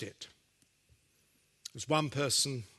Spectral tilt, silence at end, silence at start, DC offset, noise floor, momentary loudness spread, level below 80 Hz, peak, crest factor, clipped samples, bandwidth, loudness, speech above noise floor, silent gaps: -3 dB/octave; 0.15 s; 0 s; under 0.1%; -72 dBFS; 21 LU; -72 dBFS; -14 dBFS; 24 dB; under 0.1%; 12.5 kHz; -32 LUFS; 38 dB; none